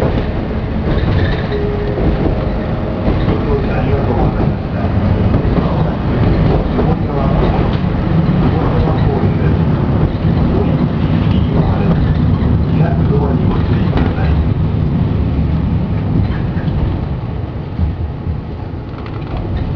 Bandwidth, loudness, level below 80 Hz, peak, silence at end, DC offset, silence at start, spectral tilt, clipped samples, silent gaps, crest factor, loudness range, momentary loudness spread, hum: 5.4 kHz; -15 LUFS; -20 dBFS; 0 dBFS; 0 s; under 0.1%; 0 s; -10.5 dB/octave; under 0.1%; none; 14 dB; 4 LU; 7 LU; none